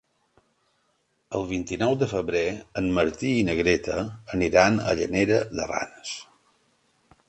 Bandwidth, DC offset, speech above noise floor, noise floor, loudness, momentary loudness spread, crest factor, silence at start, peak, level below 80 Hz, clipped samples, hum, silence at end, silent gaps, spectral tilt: 8.8 kHz; under 0.1%; 46 dB; -71 dBFS; -25 LUFS; 11 LU; 22 dB; 1.3 s; -4 dBFS; -48 dBFS; under 0.1%; none; 1.05 s; none; -5.5 dB/octave